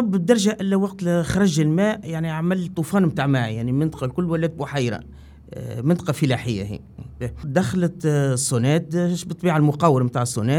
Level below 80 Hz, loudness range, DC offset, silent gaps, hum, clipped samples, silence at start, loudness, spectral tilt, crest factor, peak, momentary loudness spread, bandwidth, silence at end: -48 dBFS; 4 LU; under 0.1%; none; none; under 0.1%; 0 s; -21 LUFS; -6 dB/octave; 20 dB; -2 dBFS; 10 LU; 16 kHz; 0 s